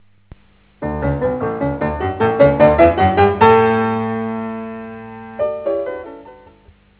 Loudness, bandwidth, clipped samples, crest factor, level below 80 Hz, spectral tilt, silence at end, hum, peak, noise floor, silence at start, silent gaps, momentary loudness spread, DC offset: -16 LUFS; 4 kHz; under 0.1%; 16 dB; -34 dBFS; -11 dB/octave; 0.65 s; none; 0 dBFS; -49 dBFS; 0.8 s; none; 19 LU; under 0.1%